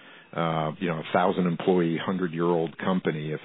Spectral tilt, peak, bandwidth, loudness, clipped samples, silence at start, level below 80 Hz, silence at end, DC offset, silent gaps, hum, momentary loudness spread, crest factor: -11 dB/octave; -8 dBFS; 4.1 kHz; -26 LUFS; under 0.1%; 0.05 s; -68 dBFS; 0 s; under 0.1%; none; none; 6 LU; 18 dB